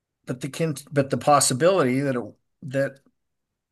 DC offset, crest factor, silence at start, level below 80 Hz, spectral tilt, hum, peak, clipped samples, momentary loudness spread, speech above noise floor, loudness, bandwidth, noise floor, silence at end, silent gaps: under 0.1%; 18 dB; 0.25 s; -68 dBFS; -4.5 dB/octave; none; -6 dBFS; under 0.1%; 15 LU; 58 dB; -23 LUFS; 13 kHz; -80 dBFS; 0.8 s; none